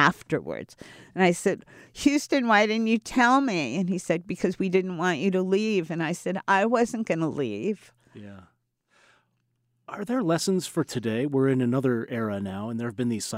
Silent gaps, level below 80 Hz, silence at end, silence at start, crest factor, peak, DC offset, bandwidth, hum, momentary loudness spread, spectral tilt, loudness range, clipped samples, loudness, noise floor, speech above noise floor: none; -62 dBFS; 0 s; 0 s; 20 dB; -6 dBFS; under 0.1%; 16 kHz; none; 11 LU; -5.5 dB/octave; 8 LU; under 0.1%; -25 LUFS; -73 dBFS; 48 dB